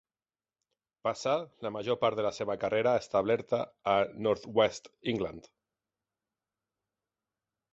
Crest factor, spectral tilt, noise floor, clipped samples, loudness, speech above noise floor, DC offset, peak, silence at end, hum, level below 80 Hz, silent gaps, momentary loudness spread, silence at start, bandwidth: 20 dB; -5 dB/octave; under -90 dBFS; under 0.1%; -31 LUFS; over 59 dB; under 0.1%; -12 dBFS; 2.35 s; none; -66 dBFS; none; 8 LU; 1.05 s; 8.2 kHz